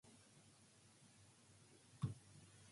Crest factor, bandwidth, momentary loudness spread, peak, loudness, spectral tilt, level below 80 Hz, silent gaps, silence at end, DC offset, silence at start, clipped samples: 24 dB; 11.5 kHz; 18 LU; -32 dBFS; -54 LUFS; -6 dB/octave; -76 dBFS; none; 0 s; under 0.1%; 0.05 s; under 0.1%